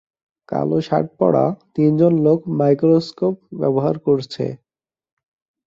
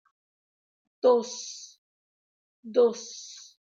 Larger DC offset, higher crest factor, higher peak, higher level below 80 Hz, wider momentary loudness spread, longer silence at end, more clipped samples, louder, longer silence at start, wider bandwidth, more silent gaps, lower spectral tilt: neither; about the same, 16 dB vs 20 dB; first, -2 dBFS vs -10 dBFS; first, -58 dBFS vs -88 dBFS; second, 9 LU vs 20 LU; first, 1.1 s vs 0.5 s; neither; first, -18 LUFS vs -26 LUFS; second, 0.5 s vs 1.05 s; about the same, 7.6 kHz vs 7.6 kHz; second, none vs 1.78-2.63 s; first, -9 dB/octave vs -3 dB/octave